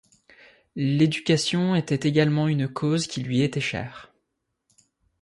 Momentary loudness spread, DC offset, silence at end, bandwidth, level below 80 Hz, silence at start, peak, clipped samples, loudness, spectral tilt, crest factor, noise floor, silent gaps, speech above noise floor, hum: 8 LU; under 0.1%; 1.15 s; 11.5 kHz; -60 dBFS; 0.75 s; -8 dBFS; under 0.1%; -24 LUFS; -6 dB/octave; 18 dB; -78 dBFS; none; 55 dB; none